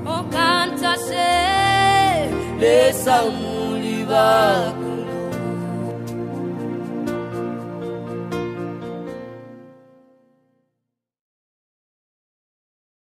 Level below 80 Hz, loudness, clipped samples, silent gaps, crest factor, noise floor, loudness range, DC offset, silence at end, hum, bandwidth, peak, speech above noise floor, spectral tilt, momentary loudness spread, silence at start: -48 dBFS; -20 LUFS; under 0.1%; none; 18 dB; -80 dBFS; 16 LU; under 0.1%; 3.4 s; none; 15.5 kHz; -4 dBFS; 64 dB; -4.5 dB/octave; 15 LU; 0 s